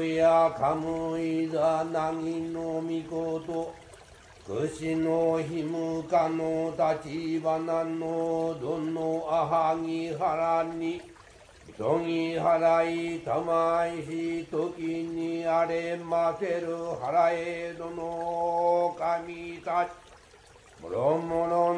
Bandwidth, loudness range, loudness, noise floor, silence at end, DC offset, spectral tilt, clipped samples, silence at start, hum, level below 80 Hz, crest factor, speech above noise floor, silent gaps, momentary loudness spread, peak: 10.5 kHz; 3 LU; -28 LUFS; -54 dBFS; 0 s; under 0.1%; -6.5 dB/octave; under 0.1%; 0 s; none; -62 dBFS; 16 dB; 27 dB; none; 8 LU; -12 dBFS